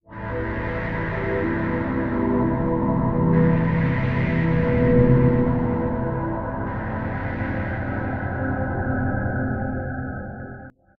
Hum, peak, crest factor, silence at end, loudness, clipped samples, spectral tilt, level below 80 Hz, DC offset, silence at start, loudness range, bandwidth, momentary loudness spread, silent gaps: none; -4 dBFS; 18 dB; 0.3 s; -23 LUFS; under 0.1%; -11 dB/octave; -34 dBFS; under 0.1%; 0.1 s; 7 LU; 4.8 kHz; 10 LU; none